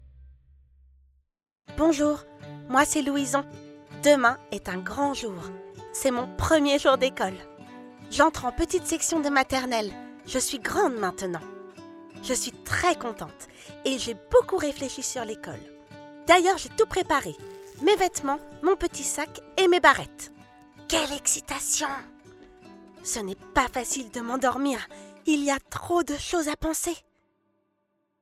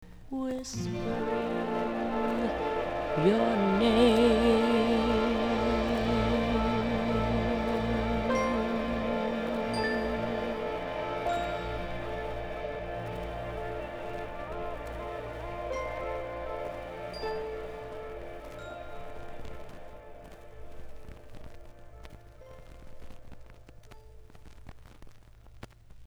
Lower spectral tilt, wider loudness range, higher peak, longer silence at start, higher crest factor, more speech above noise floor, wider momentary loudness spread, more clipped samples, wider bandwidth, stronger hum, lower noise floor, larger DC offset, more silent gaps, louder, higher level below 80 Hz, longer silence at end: second, -3 dB/octave vs -6 dB/octave; second, 5 LU vs 21 LU; first, -4 dBFS vs -10 dBFS; first, 0.2 s vs 0 s; about the same, 24 dB vs 22 dB; first, 49 dB vs 25 dB; second, 21 LU vs 24 LU; neither; first, 16 kHz vs 13.5 kHz; neither; first, -75 dBFS vs -51 dBFS; neither; neither; first, -25 LUFS vs -30 LUFS; second, -50 dBFS vs -44 dBFS; first, 1.2 s vs 0 s